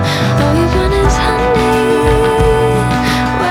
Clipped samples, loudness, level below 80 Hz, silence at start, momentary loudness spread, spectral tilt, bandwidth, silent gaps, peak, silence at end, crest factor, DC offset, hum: under 0.1%; -12 LUFS; -20 dBFS; 0 s; 2 LU; -6 dB/octave; 17 kHz; none; 0 dBFS; 0 s; 10 dB; under 0.1%; none